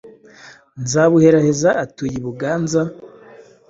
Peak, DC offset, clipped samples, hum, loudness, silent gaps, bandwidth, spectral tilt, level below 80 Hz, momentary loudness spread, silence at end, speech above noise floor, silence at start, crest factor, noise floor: -2 dBFS; under 0.1%; under 0.1%; none; -17 LUFS; none; 8 kHz; -6 dB/octave; -52 dBFS; 13 LU; 0.3 s; 28 dB; 0.05 s; 16 dB; -44 dBFS